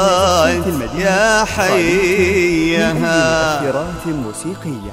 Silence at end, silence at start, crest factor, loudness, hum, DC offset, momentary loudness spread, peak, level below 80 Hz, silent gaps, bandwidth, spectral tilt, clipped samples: 0 s; 0 s; 14 dB; -15 LUFS; none; under 0.1%; 10 LU; 0 dBFS; -34 dBFS; none; 16 kHz; -4.5 dB/octave; under 0.1%